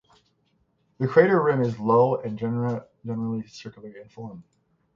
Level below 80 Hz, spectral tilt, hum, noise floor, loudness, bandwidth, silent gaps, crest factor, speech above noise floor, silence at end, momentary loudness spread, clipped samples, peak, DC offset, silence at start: -64 dBFS; -8.5 dB/octave; none; -69 dBFS; -23 LUFS; 7.2 kHz; none; 22 dB; 45 dB; 0.55 s; 21 LU; under 0.1%; -4 dBFS; under 0.1%; 1 s